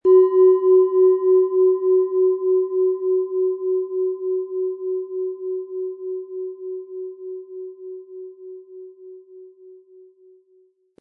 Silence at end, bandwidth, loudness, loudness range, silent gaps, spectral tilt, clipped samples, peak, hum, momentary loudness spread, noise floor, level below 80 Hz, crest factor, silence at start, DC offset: 1.25 s; 2 kHz; -19 LUFS; 21 LU; none; -10 dB/octave; under 0.1%; -6 dBFS; none; 22 LU; -59 dBFS; -80 dBFS; 14 dB; 0.05 s; under 0.1%